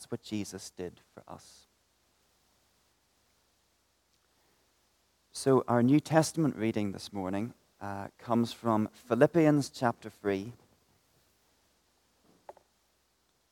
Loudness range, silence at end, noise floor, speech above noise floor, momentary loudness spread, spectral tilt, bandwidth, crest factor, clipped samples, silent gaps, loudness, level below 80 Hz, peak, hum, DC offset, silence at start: 14 LU; 3 s; -73 dBFS; 43 dB; 19 LU; -6 dB/octave; 16.5 kHz; 24 dB; under 0.1%; none; -30 LUFS; -74 dBFS; -8 dBFS; 50 Hz at -65 dBFS; under 0.1%; 0 s